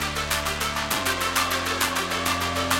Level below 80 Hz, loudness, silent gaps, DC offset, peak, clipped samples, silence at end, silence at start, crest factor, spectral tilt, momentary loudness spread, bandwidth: -44 dBFS; -24 LUFS; none; under 0.1%; -6 dBFS; under 0.1%; 0 s; 0 s; 18 dB; -2 dB/octave; 2 LU; 17 kHz